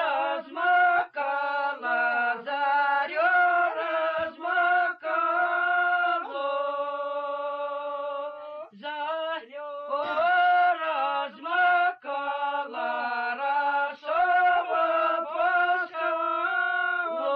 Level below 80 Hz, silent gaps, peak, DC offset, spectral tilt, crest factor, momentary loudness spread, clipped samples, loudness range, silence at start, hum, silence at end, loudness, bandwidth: -74 dBFS; none; -14 dBFS; under 0.1%; -4.5 dB/octave; 12 dB; 10 LU; under 0.1%; 6 LU; 0 s; none; 0 s; -26 LUFS; 5.2 kHz